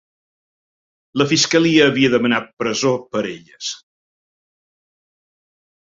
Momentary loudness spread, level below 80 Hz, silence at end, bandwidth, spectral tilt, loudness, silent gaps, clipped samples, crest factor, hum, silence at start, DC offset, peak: 14 LU; -60 dBFS; 2.1 s; 7.6 kHz; -4 dB/octave; -17 LUFS; 2.53-2.57 s; under 0.1%; 18 dB; none; 1.15 s; under 0.1%; -2 dBFS